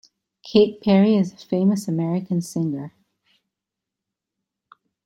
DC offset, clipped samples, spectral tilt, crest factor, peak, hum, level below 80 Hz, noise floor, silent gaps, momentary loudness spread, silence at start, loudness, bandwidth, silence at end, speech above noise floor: under 0.1%; under 0.1%; -7 dB/octave; 20 dB; -4 dBFS; none; -64 dBFS; -85 dBFS; none; 10 LU; 0.45 s; -21 LUFS; 12.5 kHz; 2.2 s; 66 dB